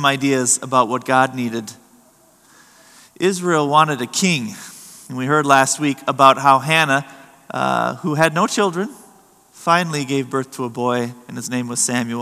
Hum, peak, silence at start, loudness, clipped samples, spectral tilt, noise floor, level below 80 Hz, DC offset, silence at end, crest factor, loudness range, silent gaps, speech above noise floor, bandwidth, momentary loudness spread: none; 0 dBFS; 0 s; -17 LUFS; under 0.1%; -3.5 dB/octave; -52 dBFS; -70 dBFS; under 0.1%; 0 s; 18 dB; 5 LU; none; 35 dB; 15 kHz; 15 LU